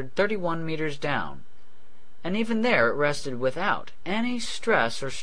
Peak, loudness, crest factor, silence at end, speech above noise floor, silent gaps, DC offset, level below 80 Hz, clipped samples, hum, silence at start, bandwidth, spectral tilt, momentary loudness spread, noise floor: -8 dBFS; -26 LUFS; 20 dB; 0 s; 33 dB; none; 3%; -54 dBFS; under 0.1%; none; 0 s; 10.5 kHz; -4.5 dB/octave; 9 LU; -59 dBFS